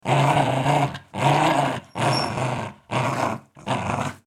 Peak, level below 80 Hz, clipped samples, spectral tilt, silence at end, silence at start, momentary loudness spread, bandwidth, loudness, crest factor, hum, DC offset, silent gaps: -4 dBFS; -54 dBFS; under 0.1%; -5.5 dB/octave; 0.1 s; 0.05 s; 9 LU; 14 kHz; -23 LUFS; 18 dB; none; under 0.1%; none